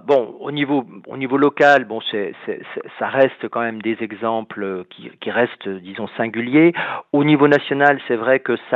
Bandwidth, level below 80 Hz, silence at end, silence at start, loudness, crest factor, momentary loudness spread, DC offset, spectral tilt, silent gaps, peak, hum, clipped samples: 7.8 kHz; -72 dBFS; 0 s; 0.05 s; -18 LUFS; 18 dB; 15 LU; under 0.1%; -7 dB/octave; none; 0 dBFS; none; under 0.1%